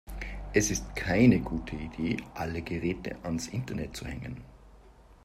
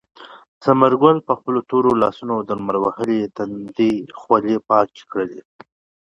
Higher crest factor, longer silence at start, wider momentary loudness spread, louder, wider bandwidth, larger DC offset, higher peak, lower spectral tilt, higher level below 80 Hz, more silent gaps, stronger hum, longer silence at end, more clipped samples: about the same, 22 dB vs 18 dB; second, 0.05 s vs 0.2 s; first, 17 LU vs 11 LU; second, -30 LUFS vs -19 LUFS; first, 15.5 kHz vs 10.5 kHz; neither; second, -8 dBFS vs 0 dBFS; second, -5.5 dB/octave vs -8 dB/octave; first, -44 dBFS vs -58 dBFS; second, none vs 0.48-0.61 s; neither; second, 0.25 s vs 0.65 s; neither